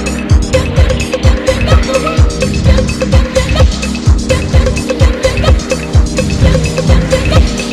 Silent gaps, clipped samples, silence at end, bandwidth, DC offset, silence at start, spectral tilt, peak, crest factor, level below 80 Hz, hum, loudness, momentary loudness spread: none; 0.2%; 0 s; 12.5 kHz; under 0.1%; 0 s; -5.5 dB/octave; 0 dBFS; 10 dB; -12 dBFS; none; -11 LUFS; 2 LU